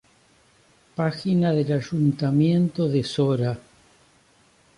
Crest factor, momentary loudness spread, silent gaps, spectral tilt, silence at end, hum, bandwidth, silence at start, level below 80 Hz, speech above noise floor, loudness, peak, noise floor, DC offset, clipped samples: 14 dB; 7 LU; none; -8 dB/octave; 1.2 s; none; 11 kHz; 1 s; -60 dBFS; 37 dB; -23 LUFS; -10 dBFS; -59 dBFS; under 0.1%; under 0.1%